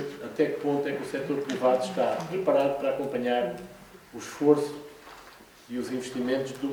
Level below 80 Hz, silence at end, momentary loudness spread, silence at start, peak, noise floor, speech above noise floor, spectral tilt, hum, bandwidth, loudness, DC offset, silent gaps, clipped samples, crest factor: -66 dBFS; 0 s; 18 LU; 0 s; -8 dBFS; -51 dBFS; 24 dB; -5.5 dB/octave; none; over 20 kHz; -28 LUFS; under 0.1%; none; under 0.1%; 20 dB